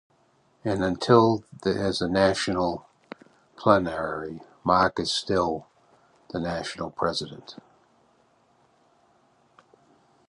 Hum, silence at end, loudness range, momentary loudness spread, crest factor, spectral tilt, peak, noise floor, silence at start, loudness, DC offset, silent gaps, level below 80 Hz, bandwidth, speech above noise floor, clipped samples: none; 2.75 s; 10 LU; 18 LU; 24 dB; -5.5 dB/octave; -4 dBFS; -64 dBFS; 0.65 s; -25 LUFS; under 0.1%; none; -54 dBFS; 11 kHz; 40 dB; under 0.1%